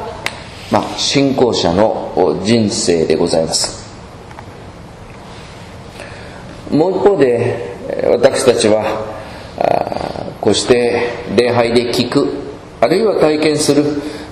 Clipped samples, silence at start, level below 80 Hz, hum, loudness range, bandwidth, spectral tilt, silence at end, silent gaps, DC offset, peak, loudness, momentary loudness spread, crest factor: 0.1%; 0 s; -42 dBFS; none; 6 LU; 14 kHz; -4.5 dB/octave; 0 s; none; under 0.1%; 0 dBFS; -14 LUFS; 21 LU; 14 dB